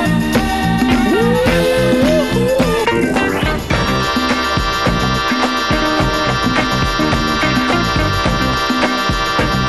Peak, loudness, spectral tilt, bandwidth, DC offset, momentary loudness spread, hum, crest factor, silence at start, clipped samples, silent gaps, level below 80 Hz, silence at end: 0 dBFS; -14 LUFS; -5 dB/octave; 15 kHz; 0.7%; 2 LU; none; 14 dB; 0 s; under 0.1%; none; -26 dBFS; 0 s